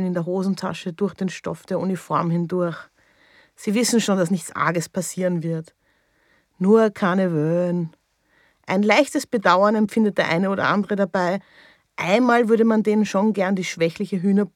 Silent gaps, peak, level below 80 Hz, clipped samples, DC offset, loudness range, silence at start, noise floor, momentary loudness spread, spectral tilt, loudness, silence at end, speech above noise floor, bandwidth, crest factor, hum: none; -2 dBFS; -68 dBFS; under 0.1%; under 0.1%; 4 LU; 0 s; -63 dBFS; 11 LU; -5.5 dB/octave; -21 LUFS; 0.05 s; 43 dB; 15.5 kHz; 18 dB; none